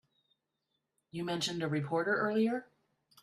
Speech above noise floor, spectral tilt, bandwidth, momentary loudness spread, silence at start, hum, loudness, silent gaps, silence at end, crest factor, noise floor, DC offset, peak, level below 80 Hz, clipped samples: 51 dB; -5 dB/octave; 13.5 kHz; 10 LU; 1.15 s; none; -33 LUFS; none; 0.6 s; 16 dB; -84 dBFS; under 0.1%; -20 dBFS; -78 dBFS; under 0.1%